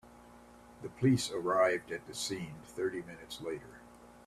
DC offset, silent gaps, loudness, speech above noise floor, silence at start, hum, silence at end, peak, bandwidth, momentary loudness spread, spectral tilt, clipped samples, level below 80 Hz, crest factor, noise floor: under 0.1%; none; -34 LUFS; 22 dB; 0.05 s; none; 0.05 s; -16 dBFS; 14 kHz; 18 LU; -5 dB/octave; under 0.1%; -66 dBFS; 20 dB; -56 dBFS